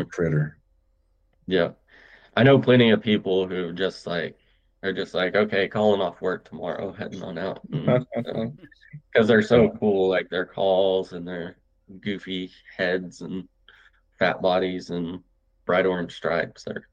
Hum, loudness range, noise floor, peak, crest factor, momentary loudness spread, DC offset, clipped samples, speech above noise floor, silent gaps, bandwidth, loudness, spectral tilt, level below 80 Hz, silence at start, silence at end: none; 6 LU; -65 dBFS; -6 dBFS; 20 dB; 16 LU; under 0.1%; under 0.1%; 42 dB; none; 8.8 kHz; -24 LUFS; -7 dB/octave; -58 dBFS; 0 s; 0.1 s